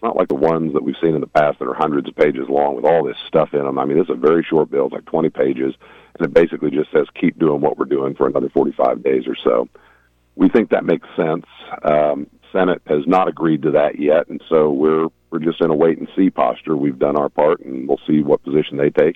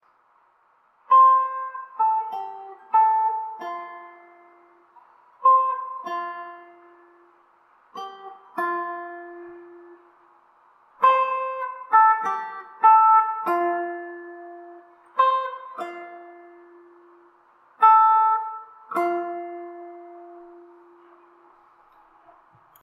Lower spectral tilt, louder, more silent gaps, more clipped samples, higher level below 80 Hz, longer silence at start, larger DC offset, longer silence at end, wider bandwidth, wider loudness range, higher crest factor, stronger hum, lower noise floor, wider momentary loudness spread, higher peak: first, -8.5 dB/octave vs -4 dB/octave; first, -17 LUFS vs -21 LUFS; neither; neither; first, -54 dBFS vs -86 dBFS; second, 0 s vs 1.1 s; neither; second, 0.05 s vs 2.4 s; second, 6 kHz vs 12.5 kHz; second, 2 LU vs 14 LU; about the same, 16 dB vs 20 dB; neither; second, -55 dBFS vs -62 dBFS; second, 5 LU vs 25 LU; first, -2 dBFS vs -6 dBFS